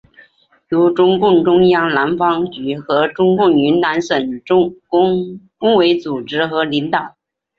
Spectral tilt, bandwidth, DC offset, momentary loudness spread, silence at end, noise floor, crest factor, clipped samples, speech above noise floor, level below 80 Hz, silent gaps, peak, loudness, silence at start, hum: -6.5 dB/octave; 7 kHz; under 0.1%; 9 LU; 0.5 s; -51 dBFS; 12 dB; under 0.1%; 37 dB; -54 dBFS; none; -2 dBFS; -15 LUFS; 0.7 s; none